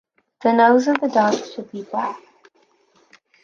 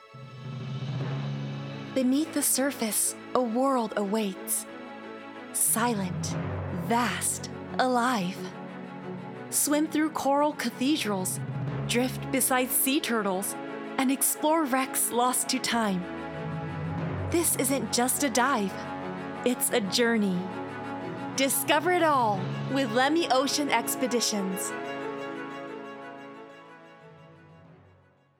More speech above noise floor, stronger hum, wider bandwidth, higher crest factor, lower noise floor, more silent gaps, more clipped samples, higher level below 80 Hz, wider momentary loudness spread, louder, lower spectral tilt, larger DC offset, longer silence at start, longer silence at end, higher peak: first, 42 dB vs 34 dB; neither; second, 7.2 kHz vs over 20 kHz; about the same, 20 dB vs 22 dB; about the same, -60 dBFS vs -61 dBFS; neither; neither; second, -72 dBFS vs -64 dBFS; first, 18 LU vs 15 LU; first, -18 LUFS vs -27 LUFS; first, -5 dB/octave vs -3.5 dB/octave; neither; first, 0.4 s vs 0 s; first, 1.25 s vs 0.65 s; first, -2 dBFS vs -8 dBFS